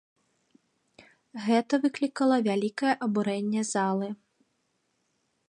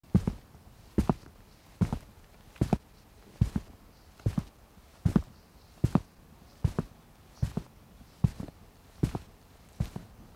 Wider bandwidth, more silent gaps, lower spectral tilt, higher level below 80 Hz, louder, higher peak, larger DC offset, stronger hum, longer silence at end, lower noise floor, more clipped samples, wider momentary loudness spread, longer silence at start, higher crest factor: second, 11 kHz vs 16 kHz; neither; second, -5 dB/octave vs -8 dB/octave; second, -80 dBFS vs -44 dBFS; first, -27 LUFS vs -33 LUFS; about the same, -12 dBFS vs -10 dBFS; neither; neither; first, 1.35 s vs 0.15 s; first, -75 dBFS vs -56 dBFS; neither; second, 10 LU vs 21 LU; first, 1 s vs 0.15 s; second, 18 dB vs 24 dB